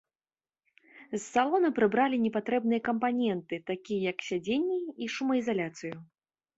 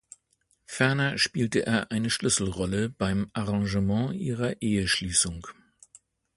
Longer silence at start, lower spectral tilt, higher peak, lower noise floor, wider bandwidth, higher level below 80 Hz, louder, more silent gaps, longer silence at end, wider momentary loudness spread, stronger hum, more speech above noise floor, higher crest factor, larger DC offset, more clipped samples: first, 0.95 s vs 0.7 s; first, -5.5 dB/octave vs -4 dB/octave; second, -12 dBFS vs -8 dBFS; first, under -90 dBFS vs -71 dBFS; second, 8 kHz vs 11.5 kHz; second, -72 dBFS vs -48 dBFS; second, -30 LUFS vs -26 LUFS; neither; second, 0.55 s vs 0.85 s; first, 11 LU vs 6 LU; neither; first, over 61 dB vs 44 dB; about the same, 20 dB vs 20 dB; neither; neither